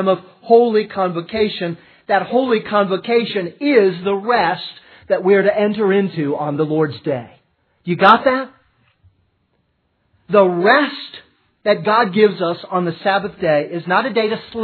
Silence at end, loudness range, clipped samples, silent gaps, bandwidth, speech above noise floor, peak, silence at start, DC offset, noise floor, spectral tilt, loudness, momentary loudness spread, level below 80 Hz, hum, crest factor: 0 s; 2 LU; under 0.1%; none; 5.4 kHz; 49 dB; 0 dBFS; 0 s; under 0.1%; -65 dBFS; -8.5 dB/octave; -17 LUFS; 11 LU; -60 dBFS; none; 18 dB